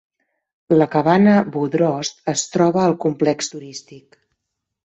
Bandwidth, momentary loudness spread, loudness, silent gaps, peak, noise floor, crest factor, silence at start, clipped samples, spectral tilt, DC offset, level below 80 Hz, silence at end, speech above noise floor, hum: 8.2 kHz; 12 LU; -18 LUFS; none; -2 dBFS; -78 dBFS; 16 dB; 0.7 s; under 0.1%; -5.5 dB/octave; under 0.1%; -60 dBFS; 0.9 s; 60 dB; none